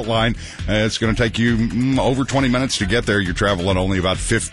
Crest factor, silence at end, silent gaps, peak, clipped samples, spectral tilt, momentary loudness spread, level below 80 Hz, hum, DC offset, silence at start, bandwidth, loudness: 14 dB; 0 s; none; -4 dBFS; under 0.1%; -5 dB/octave; 2 LU; -32 dBFS; none; 0.3%; 0 s; 11.5 kHz; -19 LUFS